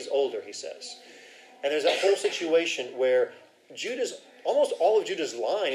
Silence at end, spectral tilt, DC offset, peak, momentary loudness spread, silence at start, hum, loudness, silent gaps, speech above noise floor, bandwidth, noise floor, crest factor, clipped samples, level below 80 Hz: 0 s; -2 dB/octave; under 0.1%; -10 dBFS; 14 LU; 0 s; none; -27 LUFS; none; 24 dB; 13.5 kHz; -51 dBFS; 16 dB; under 0.1%; under -90 dBFS